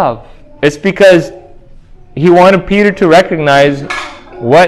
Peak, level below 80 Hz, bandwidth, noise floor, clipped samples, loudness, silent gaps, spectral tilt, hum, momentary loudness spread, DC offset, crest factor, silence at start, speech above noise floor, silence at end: 0 dBFS; -38 dBFS; 12.5 kHz; -34 dBFS; 3%; -8 LUFS; none; -6 dB/octave; none; 17 LU; under 0.1%; 10 dB; 0 s; 27 dB; 0 s